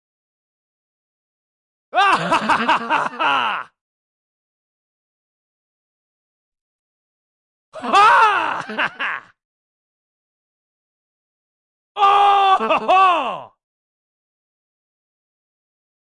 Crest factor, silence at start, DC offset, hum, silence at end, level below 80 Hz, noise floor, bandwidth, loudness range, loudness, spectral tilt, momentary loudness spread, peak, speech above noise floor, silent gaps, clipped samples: 18 dB; 1.95 s; under 0.1%; none; 2.6 s; -66 dBFS; under -90 dBFS; 11.5 kHz; 9 LU; -16 LUFS; -3 dB/octave; 14 LU; -4 dBFS; over 74 dB; 3.81-6.52 s, 6.61-7.72 s, 9.45-11.95 s; under 0.1%